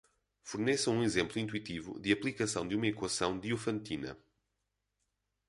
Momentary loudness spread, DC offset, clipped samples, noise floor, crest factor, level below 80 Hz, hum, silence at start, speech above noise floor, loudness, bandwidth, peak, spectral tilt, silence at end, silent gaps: 11 LU; under 0.1%; under 0.1%; -84 dBFS; 22 dB; -64 dBFS; 50 Hz at -65 dBFS; 0.45 s; 50 dB; -34 LUFS; 11.5 kHz; -14 dBFS; -4 dB/octave; 1.35 s; none